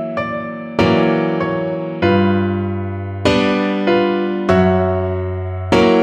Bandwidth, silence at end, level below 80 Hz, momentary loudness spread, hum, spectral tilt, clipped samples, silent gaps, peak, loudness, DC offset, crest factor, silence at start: 9.4 kHz; 0 s; -42 dBFS; 9 LU; none; -7 dB/octave; under 0.1%; none; -2 dBFS; -17 LUFS; under 0.1%; 14 dB; 0 s